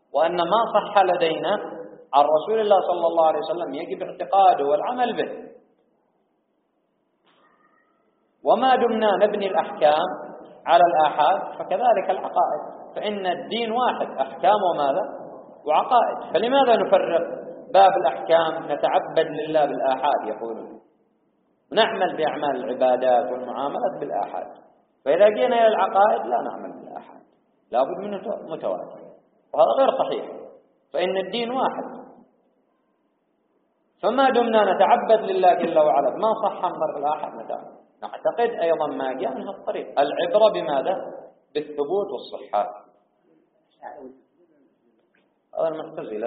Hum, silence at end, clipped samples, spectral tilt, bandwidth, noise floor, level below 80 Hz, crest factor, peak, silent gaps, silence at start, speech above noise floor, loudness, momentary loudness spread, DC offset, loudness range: none; 0 s; under 0.1%; -2 dB/octave; 4.8 kHz; -70 dBFS; -74 dBFS; 20 dB; -4 dBFS; none; 0.15 s; 49 dB; -22 LUFS; 16 LU; under 0.1%; 10 LU